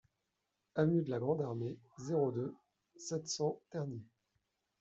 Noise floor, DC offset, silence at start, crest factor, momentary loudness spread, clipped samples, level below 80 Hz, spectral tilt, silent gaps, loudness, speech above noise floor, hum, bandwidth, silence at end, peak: -86 dBFS; under 0.1%; 0.75 s; 20 dB; 12 LU; under 0.1%; -78 dBFS; -6 dB/octave; none; -38 LUFS; 49 dB; none; 8.2 kHz; 0.75 s; -20 dBFS